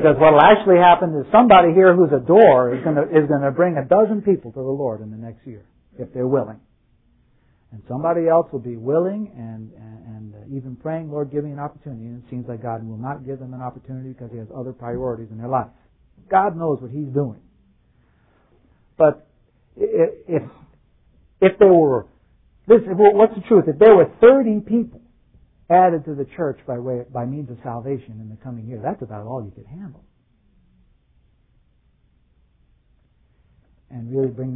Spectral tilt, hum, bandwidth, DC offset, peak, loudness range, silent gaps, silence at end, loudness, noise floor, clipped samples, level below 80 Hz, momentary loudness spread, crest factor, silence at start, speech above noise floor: -11 dB/octave; none; 3.9 kHz; under 0.1%; 0 dBFS; 17 LU; none; 0 s; -17 LUFS; -60 dBFS; under 0.1%; -54 dBFS; 23 LU; 18 dB; 0 s; 42 dB